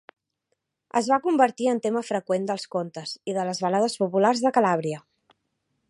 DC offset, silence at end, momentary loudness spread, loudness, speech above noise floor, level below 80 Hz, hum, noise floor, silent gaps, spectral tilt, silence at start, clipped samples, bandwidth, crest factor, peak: under 0.1%; 0.9 s; 10 LU; -24 LUFS; 54 dB; -76 dBFS; none; -78 dBFS; none; -5 dB/octave; 0.95 s; under 0.1%; 11.5 kHz; 20 dB; -6 dBFS